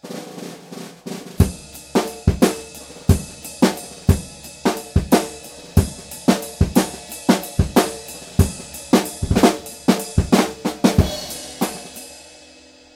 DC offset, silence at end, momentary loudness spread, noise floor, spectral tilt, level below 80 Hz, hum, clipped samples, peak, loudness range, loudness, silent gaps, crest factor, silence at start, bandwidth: under 0.1%; 0.75 s; 17 LU; -46 dBFS; -5.5 dB/octave; -30 dBFS; none; under 0.1%; 0 dBFS; 2 LU; -20 LUFS; none; 20 dB; 0.05 s; 17 kHz